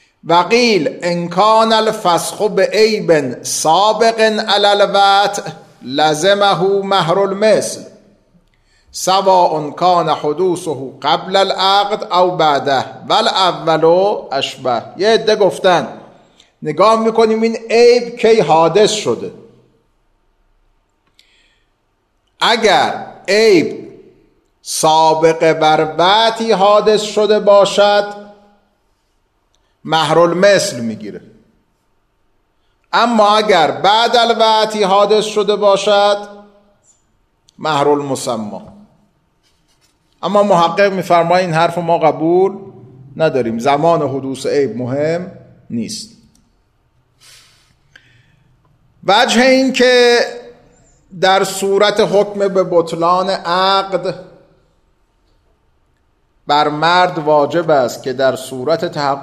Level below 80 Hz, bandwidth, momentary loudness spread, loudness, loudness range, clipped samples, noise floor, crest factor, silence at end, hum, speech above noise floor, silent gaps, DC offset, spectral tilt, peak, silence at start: -58 dBFS; 14 kHz; 12 LU; -13 LUFS; 7 LU; under 0.1%; -62 dBFS; 14 dB; 0 s; none; 50 dB; none; under 0.1%; -4 dB/octave; 0 dBFS; 0.25 s